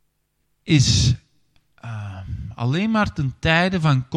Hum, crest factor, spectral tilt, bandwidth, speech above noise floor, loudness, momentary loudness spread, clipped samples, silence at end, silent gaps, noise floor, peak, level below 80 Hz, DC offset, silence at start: none; 18 dB; -5 dB/octave; 10.5 kHz; 51 dB; -19 LUFS; 16 LU; under 0.1%; 0 s; none; -70 dBFS; -2 dBFS; -40 dBFS; under 0.1%; 0.65 s